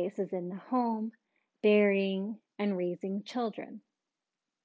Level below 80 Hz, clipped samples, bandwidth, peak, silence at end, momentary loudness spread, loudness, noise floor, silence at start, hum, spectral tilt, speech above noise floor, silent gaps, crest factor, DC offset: -88 dBFS; under 0.1%; 7.8 kHz; -14 dBFS; 0.85 s; 15 LU; -32 LUFS; -89 dBFS; 0 s; none; -7.5 dB/octave; 58 dB; none; 18 dB; under 0.1%